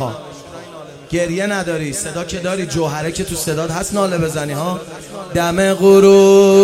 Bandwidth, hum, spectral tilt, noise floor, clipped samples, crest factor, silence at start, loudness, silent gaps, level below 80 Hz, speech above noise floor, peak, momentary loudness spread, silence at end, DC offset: 15.5 kHz; none; -5 dB/octave; -34 dBFS; under 0.1%; 14 dB; 0 s; -15 LUFS; none; -44 dBFS; 21 dB; 0 dBFS; 23 LU; 0 s; under 0.1%